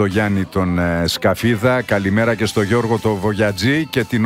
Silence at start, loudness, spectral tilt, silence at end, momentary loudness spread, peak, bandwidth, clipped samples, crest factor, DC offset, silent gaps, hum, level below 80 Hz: 0 s; -17 LUFS; -6 dB/octave; 0 s; 3 LU; -2 dBFS; 16 kHz; under 0.1%; 16 dB; under 0.1%; none; none; -42 dBFS